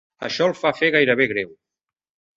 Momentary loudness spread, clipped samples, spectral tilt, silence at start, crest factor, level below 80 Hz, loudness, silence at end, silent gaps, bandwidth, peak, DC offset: 11 LU; under 0.1%; -5 dB/octave; 0.2 s; 20 dB; -62 dBFS; -19 LUFS; 0.85 s; none; 7.8 kHz; -4 dBFS; under 0.1%